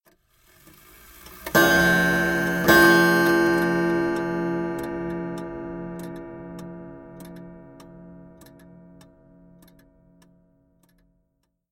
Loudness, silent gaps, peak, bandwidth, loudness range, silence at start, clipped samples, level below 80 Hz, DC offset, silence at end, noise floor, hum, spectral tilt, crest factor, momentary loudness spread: -20 LUFS; none; -2 dBFS; 17 kHz; 21 LU; 1.25 s; under 0.1%; -50 dBFS; under 0.1%; 3.55 s; -73 dBFS; none; -4.5 dB/octave; 22 dB; 26 LU